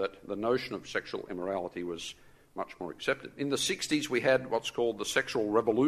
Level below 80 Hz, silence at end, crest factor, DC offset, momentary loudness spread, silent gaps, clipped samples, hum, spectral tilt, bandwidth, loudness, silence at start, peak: -64 dBFS; 0 s; 22 dB; under 0.1%; 12 LU; none; under 0.1%; none; -3.5 dB/octave; 13.5 kHz; -32 LUFS; 0 s; -10 dBFS